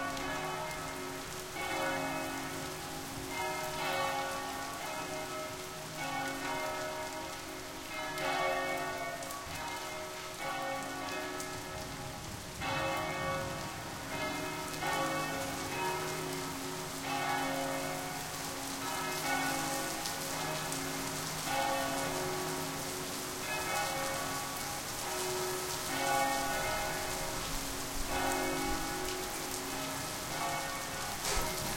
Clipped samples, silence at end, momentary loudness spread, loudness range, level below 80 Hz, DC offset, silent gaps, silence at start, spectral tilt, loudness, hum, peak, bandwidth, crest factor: under 0.1%; 0 s; 7 LU; 4 LU; -54 dBFS; under 0.1%; none; 0 s; -2.5 dB/octave; -36 LUFS; none; -16 dBFS; 17 kHz; 20 dB